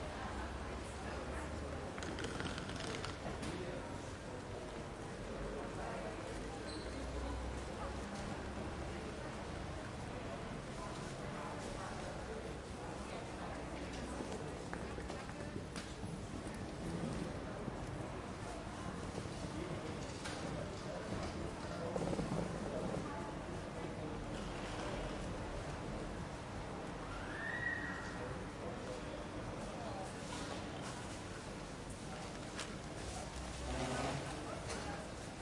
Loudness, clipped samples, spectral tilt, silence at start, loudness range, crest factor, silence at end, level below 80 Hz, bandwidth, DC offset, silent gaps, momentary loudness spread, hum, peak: -45 LUFS; under 0.1%; -5 dB/octave; 0 s; 3 LU; 20 dB; 0 s; -54 dBFS; 11.5 kHz; under 0.1%; none; 5 LU; none; -24 dBFS